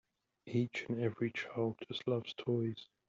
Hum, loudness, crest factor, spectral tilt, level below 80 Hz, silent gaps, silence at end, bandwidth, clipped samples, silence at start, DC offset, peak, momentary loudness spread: none; -38 LUFS; 18 dB; -5.5 dB/octave; -78 dBFS; none; 0.25 s; 7.6 kHz; under 0.1%; 0.45 s; under 0.1%; -22 dBFS; 3 LU